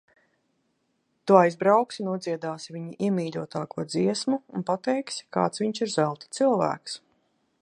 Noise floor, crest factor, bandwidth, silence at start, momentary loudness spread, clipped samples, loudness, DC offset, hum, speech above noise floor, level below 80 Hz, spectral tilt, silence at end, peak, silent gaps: -73 dBFS; 24 dB; 11 kHz; 1.25 s; 14 LU; under 0.1%; -26 LUFS; under 0.1%; none; 48 dB; -74 dBFS; -5.5 dB/octave; 0.65 s; -2 dBFS; none